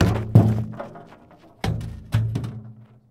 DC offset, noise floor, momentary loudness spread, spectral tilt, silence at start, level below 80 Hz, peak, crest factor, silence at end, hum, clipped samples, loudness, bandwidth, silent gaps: under 0.1%; -50 dBFS; 21 LU; -8 dB/octave; 0 s; -40 dBFS; 0 dBFS; 22 dB; 0.25 s; none; under 0.1%; -23 LUFS; 12.5 kHz; none